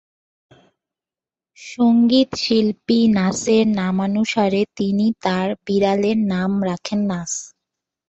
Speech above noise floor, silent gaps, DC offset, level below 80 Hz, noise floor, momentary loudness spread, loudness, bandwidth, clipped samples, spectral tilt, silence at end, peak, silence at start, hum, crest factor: over 72 dB; none; under 0.1%; -56 dBFS; under -90 dBFS; 7 LU; -19 LUFS; 8.2 kHz; under 0.1%; -5.5 dB/octave; 0.65 s; -4 dBFS; 1.6 s; none; 16 dB